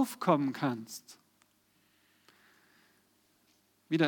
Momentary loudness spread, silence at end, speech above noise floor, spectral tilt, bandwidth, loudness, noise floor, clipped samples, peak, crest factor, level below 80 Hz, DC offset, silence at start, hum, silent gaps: 18 LU; 0 s; 39 dB; -6 dB/octave; 19 kHz; -33 LUFS; -71 dBFS; under 0.1%; -12 dBFS; 24 dB; under -90 dBFS; under 0.1%; 0 s; none; none